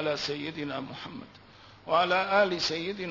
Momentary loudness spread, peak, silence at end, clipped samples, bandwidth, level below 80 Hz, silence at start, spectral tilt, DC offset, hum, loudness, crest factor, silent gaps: 17 LU; -12 dBFS; 0 s; under 0.1%; 6 kHz; -66 dBFS; 0 s; -4 dB/octave; under 0.1%; none; -28 LUFS; 18 dB; none